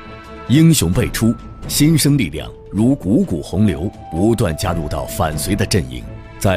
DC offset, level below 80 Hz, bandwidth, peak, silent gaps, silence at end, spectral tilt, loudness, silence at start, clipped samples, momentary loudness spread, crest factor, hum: under 0.1%; -32 dBFS; 16 kHz; 0 dBFS; none; 0 s; -5.5 dB/octave; -17 LUFS; 0 s; under 0.1%; 14 LU; 16 dB; none